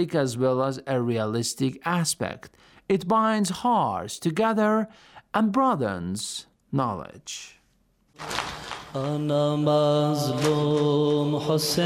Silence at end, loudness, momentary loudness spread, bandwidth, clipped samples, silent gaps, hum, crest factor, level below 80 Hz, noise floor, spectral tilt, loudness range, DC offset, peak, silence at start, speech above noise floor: 0 s; -25 LUFS; 14 LU; 17 kHz; under 0.1%; none; none; 16 dB; -60 dBFS; -65 dBFS; -5.5 dB/octave; 6 LU; under 0.1%; -8 dBFS; 0 s; 41 dB